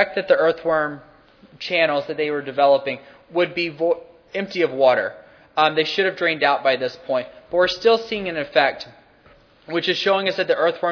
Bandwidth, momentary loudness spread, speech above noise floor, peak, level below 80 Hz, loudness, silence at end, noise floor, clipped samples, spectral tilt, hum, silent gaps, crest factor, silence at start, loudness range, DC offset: 5.4 kHz; 11 LU; 32 dB; 0 dBFS; -62 dBFS; -20 LUFS; 0 s; -52 dBFS; under 0.1%; -5 dB/octave; none; none; 20 dB; 0 s; 2 LU; under 0.1%